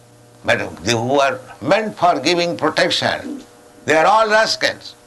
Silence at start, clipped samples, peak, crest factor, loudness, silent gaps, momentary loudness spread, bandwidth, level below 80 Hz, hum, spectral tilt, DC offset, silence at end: 0.45 s; under 0.1%; -4 dBFS; 14 dB; -17 LUFS; none; 13 LU; 12 kHz; -54 dBFS; none; -3.5 dB/octave; under 0.1%; 0.15 s